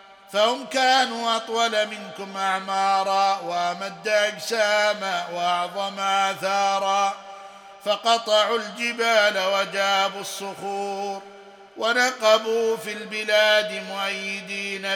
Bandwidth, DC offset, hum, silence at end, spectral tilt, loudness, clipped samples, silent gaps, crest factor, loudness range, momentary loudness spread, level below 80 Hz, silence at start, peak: 17.5 kHz; under 0.1%; none; 0 s; -1.5 dB/octave; -22 LUFS; under 0.1%; none; 20 dB; 2 LU; 10 LU; -78 dBFS; 0.05 s; -4 dBFS